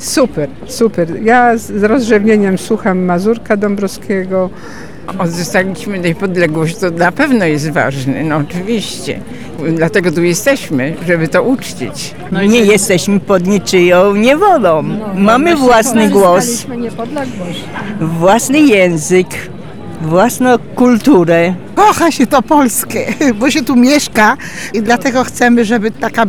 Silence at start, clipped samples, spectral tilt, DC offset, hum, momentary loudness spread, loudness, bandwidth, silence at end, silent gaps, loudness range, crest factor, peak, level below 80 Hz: 0 s; under 0.1%; -5 dB/octave; 3%; none; 12 LU; -11 LUFS; 18.5 kHz; 0 s; none; 5 LU; 10 dB; 0 dBFS; -42 dBFS